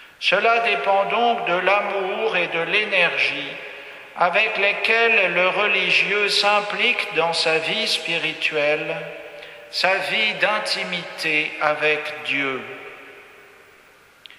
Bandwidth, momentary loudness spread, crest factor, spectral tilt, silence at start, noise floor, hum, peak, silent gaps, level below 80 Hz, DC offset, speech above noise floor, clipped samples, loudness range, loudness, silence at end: 14.5 kHz; 14 LU; 20 dB; -2.5 dB/octave; 0 s; -51 dBFS; none; -2 dBFS; none; -70 dBFS; under 0.1%; 31 dB; under 0.1%; 4 LU; -19 LUFS; 1.1 s